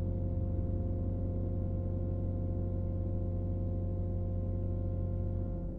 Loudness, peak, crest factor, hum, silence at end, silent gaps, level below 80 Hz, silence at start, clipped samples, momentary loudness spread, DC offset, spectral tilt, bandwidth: -36 LUFS; -24 dBFS; 10 dB; none; 0 s; none; -40 dBFS; 0 s; under 0.1%; 1 LU; under 0.1%; -13 dB/octave; 1.6 kHz